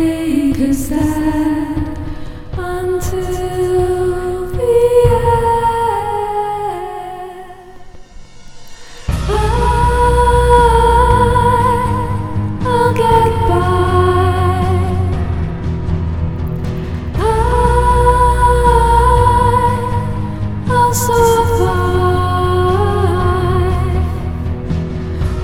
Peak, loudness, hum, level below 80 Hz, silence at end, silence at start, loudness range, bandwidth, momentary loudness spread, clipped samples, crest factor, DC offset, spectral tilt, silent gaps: 0 dBFS; -14 LUFS; none; -22 dBFS; 0 s; 0 s; 6 LU; 17 kHz; 11 LU; under 0.1%; 14 dB; 0.9%; -6.5 dB/octave; none